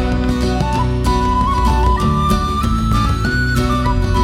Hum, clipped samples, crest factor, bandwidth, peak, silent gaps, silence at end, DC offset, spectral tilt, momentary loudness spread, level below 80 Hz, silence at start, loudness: none; under 0.1%; 12 dB; 15 kHz; -2 dBFS; none; 0 s; under 0.1%; -6 dB/octave; 2 LU; -20 dBFS; 0 s; -16 LUFS